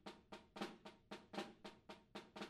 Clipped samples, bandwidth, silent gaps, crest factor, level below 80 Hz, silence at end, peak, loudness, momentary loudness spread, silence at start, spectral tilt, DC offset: under 0.1%; 13 kHz; none; 22 dB; -80 dBFS; 0 s; -32 dBFS; -55 LUFS; 9 LU; 0 s; -4.5 dB/octave; under 0.1%